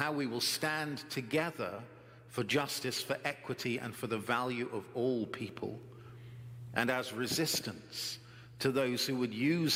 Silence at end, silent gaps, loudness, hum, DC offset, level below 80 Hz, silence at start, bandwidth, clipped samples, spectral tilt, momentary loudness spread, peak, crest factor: 0 s; none; -35 LUFS; none; under 0.1%; -74 dBFS; 0 s; 16.5 kHz; under 0.1%; -4 dB/octave; 16 LU; -12 dBFS; 24 dB